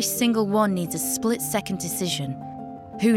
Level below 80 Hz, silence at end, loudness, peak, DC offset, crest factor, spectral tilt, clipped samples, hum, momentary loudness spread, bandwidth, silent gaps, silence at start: -60 dBFS; 0 s; -24 LUFS; -8 dBFS; under 0.1%; 16 dB; -4 dB/octave; under 0.1%; none; 14 LU; 18 kHz; none; 0 s